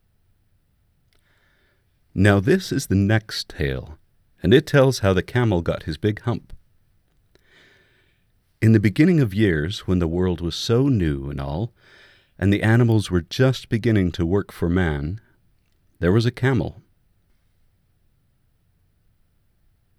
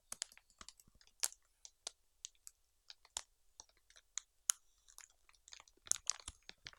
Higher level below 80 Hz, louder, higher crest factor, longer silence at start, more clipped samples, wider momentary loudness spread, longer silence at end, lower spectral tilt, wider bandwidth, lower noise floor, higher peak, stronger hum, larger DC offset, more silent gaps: first, -42 dBFS vs -74 dBFS; first, -21 LUFS vs -43 LUFS; second, 20 dB vs 42 dB; first, 2.15 s vs 0.1 s; neither; second, 11 LU vs 23 LU; first, 3.25 s vs 0.1 s; first, -7 dB/octave vs 2 dB/octave; second, 14.5 kHz vs 17 kHz; second, -64 dBFS vs -70 dBFS; first, -2 dBFS vs -8 dBFS; neither; neither; neither